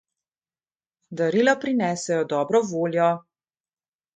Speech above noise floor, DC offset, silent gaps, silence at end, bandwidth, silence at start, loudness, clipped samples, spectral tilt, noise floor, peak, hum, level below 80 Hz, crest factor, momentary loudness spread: over 68 dB; under 0.1%; none; 1 s; 9.4 kHz; 1.1 s; -23 LUFS; under 0.1%; -5 dB/octave; under -90 dBFS; -6 dBFS; none; -72 dBFS; 18 dB; 6 LU